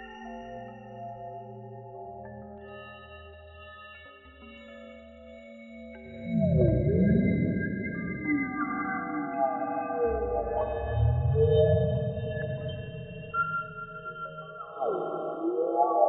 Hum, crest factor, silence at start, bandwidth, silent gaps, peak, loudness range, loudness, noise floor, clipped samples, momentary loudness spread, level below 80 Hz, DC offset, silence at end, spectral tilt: none; 20 dB; 0 s; 4.1 kHz; none; -10 dBFS; 18 LU; -29 LUFS; -50 dBFS; under 0.1%; 23 LU; -44 dBFS; under 0.1%; 0 s; -7.5 dB/octave